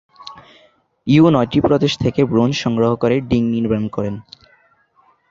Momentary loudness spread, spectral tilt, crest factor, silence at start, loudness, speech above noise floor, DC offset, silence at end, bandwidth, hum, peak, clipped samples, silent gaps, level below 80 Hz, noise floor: 18 LU; -7 dB/octave; 16 dB; 0.2 s; -16 LUFS; 41 dB; under 0.1%; 1.1 s; 7.6 kHz; none; -2 dBFS; under 0.1%; none; -44 dBFS; -57 dBFS